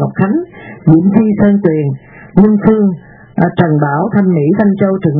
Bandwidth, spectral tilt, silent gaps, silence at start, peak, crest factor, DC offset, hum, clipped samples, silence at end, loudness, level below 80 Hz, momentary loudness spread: 3.9 kHz; -12.5 dB/octave; none; 0 s; 0 dBFS; 10 dB; under 0.1%; none; 0.6%; 0 s; -11 LUFS; -42 dBFS; 10 LU